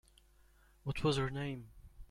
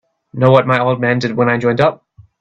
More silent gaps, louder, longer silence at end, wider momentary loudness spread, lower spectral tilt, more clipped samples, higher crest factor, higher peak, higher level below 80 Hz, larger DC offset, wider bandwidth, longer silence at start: neither; second, -38 LUFS vs -14 LUFS; second, 0.05 s vs 0.45 s; first, 15 LU vs 5 LU; second, -6 dB/octave vs -7.5 dB/octave; neither; first, 20 dB vs 14 dB; second, -20 dBFS vs 0 dBFS; about the same, -54 dBFS vs -52 dBFS; neither; first, 13.5 kHz vs 7.6 kHz; first, 0.85 s vs 0.35 s